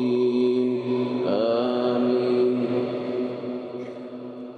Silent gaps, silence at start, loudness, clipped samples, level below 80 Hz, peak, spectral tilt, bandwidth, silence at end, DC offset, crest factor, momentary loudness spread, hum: none; 0 s; -24 LUFS; under 0.1%; -78 dBFS; -12 dBFS; -8 dB/octave; 6 kHz; 0 s; under 0.1%; 12 dB; 13 LU; none